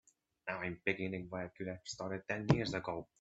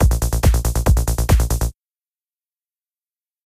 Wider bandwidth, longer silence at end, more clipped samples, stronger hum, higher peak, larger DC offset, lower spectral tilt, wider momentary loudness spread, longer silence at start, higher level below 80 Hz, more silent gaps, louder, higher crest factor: second, 8 kHz vs 16 kHz; second, 0.15 s vs 1.75 s; neither; neither; second, -12 dBFS vs -4 dBFS; neither; about the same, -6 dB/octave vs -5.5 dB/octave; first, 11 LU vs 5 LU; first, 0.45 s vs 0 s; second, -62 dBFS vs -20 dBFS; neither; second, -39 LUFS vs -19 LUFS; first, 28 dB vs 16 dB